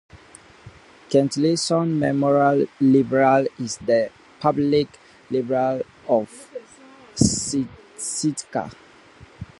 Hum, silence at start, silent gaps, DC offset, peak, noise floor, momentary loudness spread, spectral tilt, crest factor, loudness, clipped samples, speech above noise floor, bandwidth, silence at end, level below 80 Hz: none; 0.15 s; none; under 0.1%; -2 dBFS; -48 dBFS; 14 LU; -5 dB/octave; 20 dB; -21 LUFS; under 0.1%; 28 dB; 11.5 kHz; 0.15 s; -50 dBFS